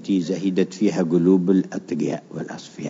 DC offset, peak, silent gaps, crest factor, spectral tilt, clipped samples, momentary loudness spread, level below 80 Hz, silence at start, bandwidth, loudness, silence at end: under 0.1%; -6 dBFS; none; 16 dB; -7.5 dB/octave; under 0.1%; 14 LU; -70 dBFS; 0 s; 7.8 kHz; -21 LUFS; 0 s